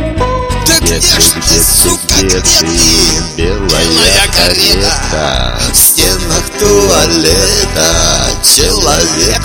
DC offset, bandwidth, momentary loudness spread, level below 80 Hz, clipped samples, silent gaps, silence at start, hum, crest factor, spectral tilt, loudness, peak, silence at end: under 0.1%; over 20 kHz; 7 LU; -18 dBFS; 1%; none; 0 s; none; 8 dB; -2 dB/octave; -7 LUFS; 0 dBFS; 0 s